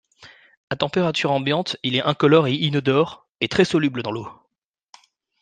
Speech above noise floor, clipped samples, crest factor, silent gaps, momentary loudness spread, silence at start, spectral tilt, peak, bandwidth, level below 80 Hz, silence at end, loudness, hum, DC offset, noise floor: 56 dB; under 0.1%; 20 dB; 0.57-0.68 s, 3.29-3.33 s; 12 LU; 0.2 s; -6 dB/octave; -2 dBFS; 9.4 kHz; -60 dBFS; 1.1 s; -20 LUFS; none; under 0.1%; -76 dBFS